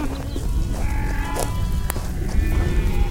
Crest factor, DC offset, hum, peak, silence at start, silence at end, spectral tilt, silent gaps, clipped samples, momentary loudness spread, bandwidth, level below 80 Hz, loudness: 18 dB; under 0.1%; none; -2 dBFS; 0 s; 0 s; -5.5 dB/octave; none; under 0.1%; 5 LU; 17 kHz; -22 dBFS; -25 LUFS